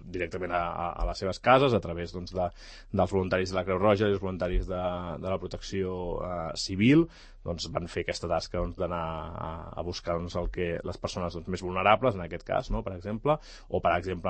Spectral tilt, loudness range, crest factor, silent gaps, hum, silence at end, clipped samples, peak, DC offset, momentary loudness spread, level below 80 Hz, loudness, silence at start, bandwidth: -6 dB/octave; 6 LU; 22 dB; none; none; 0 s; under 0.1%; -6 dBFS; under 0.1%; 12 LU; -42 dBFS; -30 LUFS; 0 s; 8.8 kHz